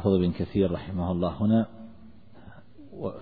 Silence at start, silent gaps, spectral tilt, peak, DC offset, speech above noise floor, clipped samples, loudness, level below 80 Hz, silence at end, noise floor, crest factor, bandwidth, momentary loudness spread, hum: 0 s; none; -11.5 dB/octave; -10 dBFS; 0.4%; 26 dB; under 0.1%; -27 LUFS; -50 dBFS; 0 s; -51 dBFS; 18 dB; 4.9 kHz; 22 LU; none